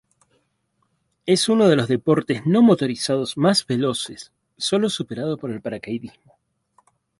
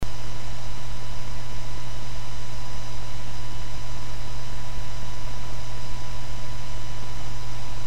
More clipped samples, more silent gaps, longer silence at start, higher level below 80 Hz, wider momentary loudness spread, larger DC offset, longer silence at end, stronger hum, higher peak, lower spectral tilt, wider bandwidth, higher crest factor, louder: neither; neither; first, 1.25 s vs 0 s; second, -62 dBFS vs -38 dBFS; first, 15 LU vs 1 LU; second, under 0.1% vs 20%; first, 1.1 s vs 0 s; neither; first, -4 dBFS vs -10 dBFS; about the same, -5 dB/octave vs -4.5 dB/octave; second, 11.5 kHz vs 16 kHz; about the same, 18 dB vs 16 dB; first, -20 LUFS vs -37 LUFS